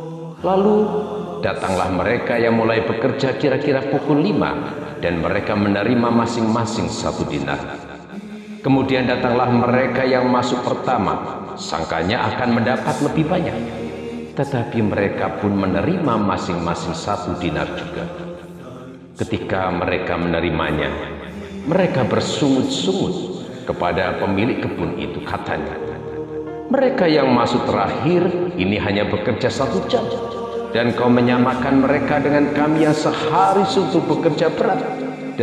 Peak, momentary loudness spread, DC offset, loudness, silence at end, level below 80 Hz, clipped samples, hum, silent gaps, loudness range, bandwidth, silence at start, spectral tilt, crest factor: -2 dBFS; 12 LU; under 0.1%; -19 LUFS; 0 s; -42 dBFS; under 0.1%; none; none; 5 LU; 11.5 kHz; 0 s; -6 dB/octave; 16 dB